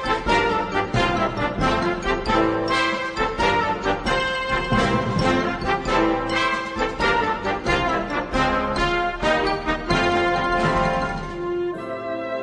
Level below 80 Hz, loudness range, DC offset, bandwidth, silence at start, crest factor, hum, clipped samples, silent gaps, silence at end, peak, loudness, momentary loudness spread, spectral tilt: -36 dBFS; 1 LU; under 0.1%; 10.5 kHz; 0 s; 16 dB; none; under 0.1%; none; 0 s; -6 dBFS; -22 LUFS; 5 LU; -5 dB/octave